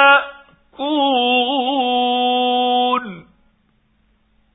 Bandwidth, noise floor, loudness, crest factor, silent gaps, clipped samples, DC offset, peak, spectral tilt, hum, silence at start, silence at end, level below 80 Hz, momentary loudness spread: 4 kHz; -61 dBFS; -17 LUFS; 18 dB; none; under 0.1%; under 0.1%; 0 dBFS; -8 dB/octave; none; 0 s; 1.35 s; -62 dBFS; 9 LU